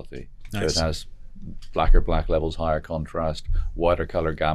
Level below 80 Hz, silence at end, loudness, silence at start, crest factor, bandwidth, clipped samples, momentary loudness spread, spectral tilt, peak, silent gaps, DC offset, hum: -26 dBFS; 0 s; -26 LUFS; 0 s; 18 dB; 11.5 kHz; under 0.1%; 19 LU; -5.5 dB/octave; -4 dBFS; none; under 0.1%; none